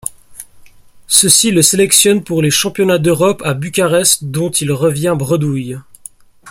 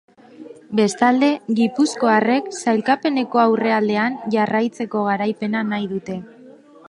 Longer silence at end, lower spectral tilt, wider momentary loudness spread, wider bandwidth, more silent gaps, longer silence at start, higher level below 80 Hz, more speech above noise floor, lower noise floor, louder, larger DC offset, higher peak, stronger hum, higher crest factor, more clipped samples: second, 0 s vs 0.4 s; second, -3.5 dB/octave vs -5 dB/octave; first, 11 LU vs 7 LU; first, over 20 kHz vs 11.5 kHz; neither; second, 0.05 s vs 0.4 s; first, -48 dBFS vs -66 dBFS; about the same, 28 dB vs 26 dB; second, -40 dBFS vs -45 dBFS; first, -12 LUFS vs -19 LUFS; neither; about the same, 0 dBFS vs -2 dBFS; neither; about the same, 14 dB vs 16 dB; first, 0.1% vs under 0.1%